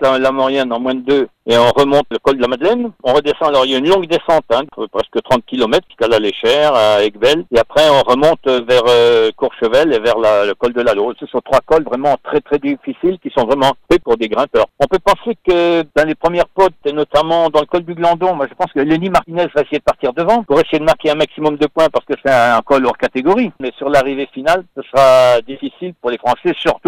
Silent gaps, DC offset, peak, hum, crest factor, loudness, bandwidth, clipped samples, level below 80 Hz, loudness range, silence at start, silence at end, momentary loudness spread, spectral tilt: none; under 0.1%; 0 dBFS; none; 14 dB; -14 LUFS; 16.5 kHz; under 0.1%; -42 dBFS; 3 LU; 0 s; 0.1 s; 7 LU; -5 dB/octave